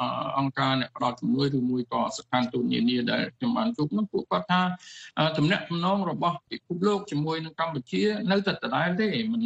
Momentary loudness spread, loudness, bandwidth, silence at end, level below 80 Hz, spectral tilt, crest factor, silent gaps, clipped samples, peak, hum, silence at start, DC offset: 4 LU; -27 LUFS; 8.4 kHz; 0 s; -66 dBFS; -6 dB/octave; 18 dB; none; under 0.1%; -10 dBFS; none; 0 s; under 0.1%